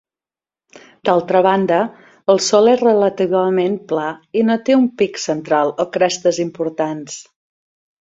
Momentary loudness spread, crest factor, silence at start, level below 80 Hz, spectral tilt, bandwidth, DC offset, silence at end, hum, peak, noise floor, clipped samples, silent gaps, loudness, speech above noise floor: 10 LU; 16 dB; 1.05 s; -62 dBFS; -4.5 dB/octave; 8 kHz; under 0.1%; 0.8 s; none; 0 dBFS; under -90 dBFS; under 0.1%; none; -16 LUFS; over 74 dB